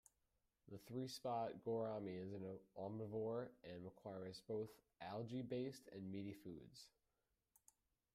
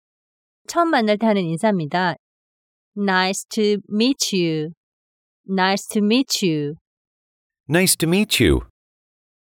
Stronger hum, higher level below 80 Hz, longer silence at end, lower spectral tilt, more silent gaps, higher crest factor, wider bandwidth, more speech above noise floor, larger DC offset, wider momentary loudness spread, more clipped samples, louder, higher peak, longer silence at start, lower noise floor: neither; second, -84 dBFS vs -42 dBFS; first, 1.25 s vs 0.85 s; first, -6.5 dB/octave vs -4 dB/octave; second, none vs 2.19-2.92 s, 4.77-5.44 s, 6.81-7.50 s, 7.60-7.64 s; about the same, 16 dB vs 18 dB; second, 15.5 kHz vs 18.5 kHz; second, 40 dB vs over 71 dB; neither; first, 12 LU vs 9 LU; neither; second, -50 LUFS vs -19 LUFS; second, -34 dBFS vs -4 dBFS; about the same, 0.65 s vs 0.7 s; about the same, -89 dBFS vs under -90 dBFS